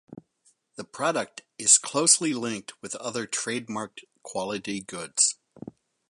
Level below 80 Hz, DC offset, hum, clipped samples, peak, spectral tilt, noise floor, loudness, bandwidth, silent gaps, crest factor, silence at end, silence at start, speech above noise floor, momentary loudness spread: -74 dBFS; under 0.1%; none; under 0.1%; -4 dBFS; -1.5 dB/octave; -67 dBFS; -24 LUFS; 11.5 kHz; none; 26 dB; 0.4 s; 0.1 s; 40 dB; 23 LU